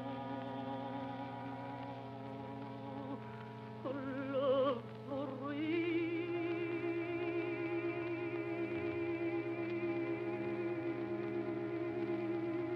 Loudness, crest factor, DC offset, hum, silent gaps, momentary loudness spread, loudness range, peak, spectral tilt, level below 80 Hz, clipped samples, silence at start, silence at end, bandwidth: -40 LUFS; 16 dB; under 0.1%; none; none; 9 LU; 7 LU; -24 dBFS; -8.5 dB/octave; -78 dBFS; under 0.1%; 0 s; 0 s; 5.6 kHz